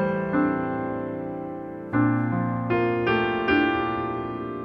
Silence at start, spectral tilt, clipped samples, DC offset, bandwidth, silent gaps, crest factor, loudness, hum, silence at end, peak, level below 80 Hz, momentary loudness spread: 0 s; -9 dB/octave; under 0.1%; under 0.1%; 5.8 kHz; none; 16 dB; -25 LUFS; none; 0 s; -8 dBFS; -52 dBFS; 10 LU